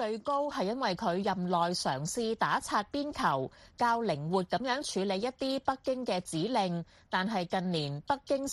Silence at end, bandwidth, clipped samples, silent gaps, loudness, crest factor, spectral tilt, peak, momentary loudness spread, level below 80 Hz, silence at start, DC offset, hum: 0 s; 12.5 kHz; under 0.1%; none; -32 LUFS; 16 dB; -4.5 dB/octave; -14 dBFS; 4 LU; -64 dBFS; 0 s; under 0.1%; none